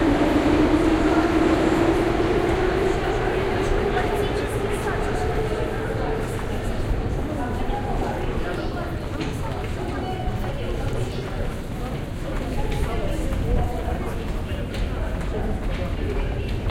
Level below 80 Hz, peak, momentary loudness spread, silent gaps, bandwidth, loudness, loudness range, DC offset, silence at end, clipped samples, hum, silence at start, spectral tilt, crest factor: -28 dBFS; -6 dBFS; 10 LU; none; 16 kHz; -24 LUFS; 7 LU; under 0.1%; 0 s; under 0.1%; none; 0 s; -6.5 dB/octave; 16 dB